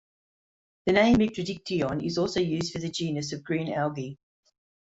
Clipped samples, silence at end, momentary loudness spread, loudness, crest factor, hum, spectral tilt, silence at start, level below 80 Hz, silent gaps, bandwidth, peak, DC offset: under 0.1%; 0.75 s; 11 LU; -27 LUFS; 20 dB; none; -5.5 dB/octave; 0.85 s; -54 dBFS; none; 8 kHz; -8 dBFS; under 0.1%